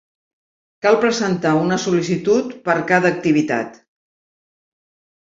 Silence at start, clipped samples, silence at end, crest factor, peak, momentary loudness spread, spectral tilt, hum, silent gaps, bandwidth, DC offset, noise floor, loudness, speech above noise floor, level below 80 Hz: 0.85 s; under 0.1%; 1.45 s; 18 dB; -2 dBFS; 6 LU; -5.5 dB/octave; none; none; 7.8 kHz; under 0.1%; under -90 dBFS; -18 LUFS; over 73 dB; -60 dBFS